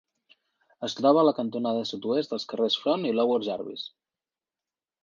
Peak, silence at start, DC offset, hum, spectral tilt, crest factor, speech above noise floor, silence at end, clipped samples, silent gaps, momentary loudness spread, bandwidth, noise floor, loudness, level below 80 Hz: -8 dBFS; 0.8 s; under 0.1%; none; -5.5 dB/octave; 20 dB; over 64 dB; 1.15 s; under 0.1%; none; 14 LU; 7.4 kHz; under -90 dBFS; -26 LUFS; -78 dBFS